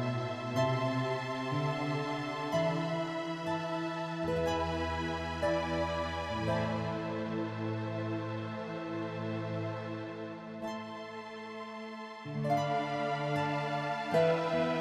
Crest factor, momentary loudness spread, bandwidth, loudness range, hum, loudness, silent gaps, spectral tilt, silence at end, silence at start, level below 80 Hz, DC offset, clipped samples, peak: 18 dB; 10 LU; 14 kHz; 6 LU; none; -35 LUFS; none; -6.5 dB/octave; 0 s; 0 s; -56 dBFS; under 0.1%; under 0.1%; -16 dBFS